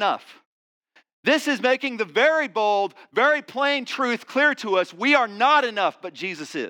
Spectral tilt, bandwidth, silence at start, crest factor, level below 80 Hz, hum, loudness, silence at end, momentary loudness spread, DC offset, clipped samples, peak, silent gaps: -3 dB/octave; 18.5 kHz; 0 s; 18 dB; -90 dBFS; none; -21 LUFS; 0 s; 8 LU; under 0.1%; under 0.1%; -4 dBFS; 0.46-0.81 s, 1.13-1.23 s